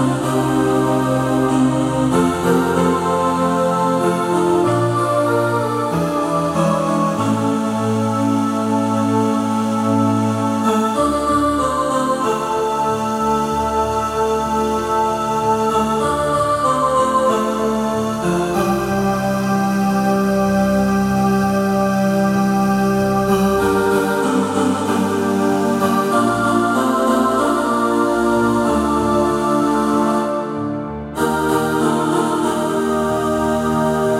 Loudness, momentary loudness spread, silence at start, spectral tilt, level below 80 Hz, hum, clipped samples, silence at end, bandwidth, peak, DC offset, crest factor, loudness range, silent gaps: -17 LUFS; 3 LU; 0 s; -6 dB/octave; -42 dBFS; none; under 0.1%; 0 s; 16.5 kHz; -4 dBFS; under 0.1%; 14 dB; 2 LU; none